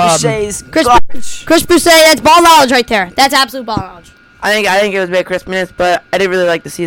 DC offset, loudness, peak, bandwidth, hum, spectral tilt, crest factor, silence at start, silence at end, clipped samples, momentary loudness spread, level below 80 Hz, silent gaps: under 0.1%; -10 LUFS; 0 dBFS; 19 kHz; none; -3 dB/octave; 10 dB; 0 s; 0 s; under 0.1%; 14 LU; -34 dBFS; none